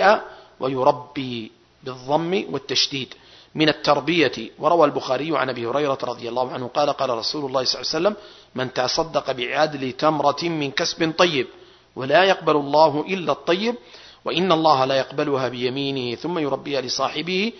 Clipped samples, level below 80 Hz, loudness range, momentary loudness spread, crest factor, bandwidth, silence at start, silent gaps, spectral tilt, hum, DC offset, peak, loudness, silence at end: under 0.1%; -60 dBFS; 3 LU; 12 LU; 20 dB; 6.4 kHz; 0 s; none; -4.5 dB/octave; none; under 0.1%; -2 dBFS; -21 LUFS; 0 s